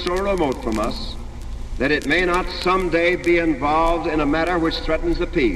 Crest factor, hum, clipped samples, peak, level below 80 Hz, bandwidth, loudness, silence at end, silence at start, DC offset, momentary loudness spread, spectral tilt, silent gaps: 16 dB; none; under 0.1%; -4 dBFS; -30 dBFS; 13.5 kHz; -20 LUFS; 0 s; 0 s; under 0.1%; 12 LU; -5.5 dB/octave; none